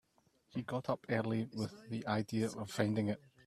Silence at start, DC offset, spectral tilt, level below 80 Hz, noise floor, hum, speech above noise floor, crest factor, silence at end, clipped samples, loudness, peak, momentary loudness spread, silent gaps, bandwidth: 0.55 s; under 0.1%; -6.5 dB/octave; -72 dBFS; -74 dBFS; none; 37 dB; 22 dB; 0.3 s; under 0.1%; -38 LUFS; -16 dBFS; 8 LU; none; 14 kHz